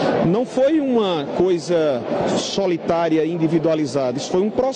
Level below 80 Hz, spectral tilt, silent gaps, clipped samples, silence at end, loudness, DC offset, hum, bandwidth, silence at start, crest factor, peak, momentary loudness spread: -54 dBFS; -6 dB/octave; none; under 0.1%; 0 s; -19 LUFS; under 0.1%; none; 9.6 kHz; 0 s; 14 dB; -4 dBFS; 3 LU